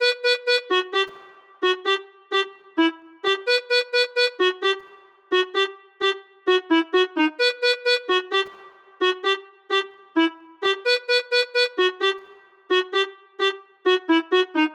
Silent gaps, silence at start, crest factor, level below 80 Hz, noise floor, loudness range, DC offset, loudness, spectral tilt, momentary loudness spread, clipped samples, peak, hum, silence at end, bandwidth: none; 0 s; 14 dB; -82 dBFS; -49 dBFS; 2 LU; under 0.1%; -22 LUFS; -1 dB/octave; 6 LU; under 0.1%; -8 dBFS; none; 0 s; 12 kHz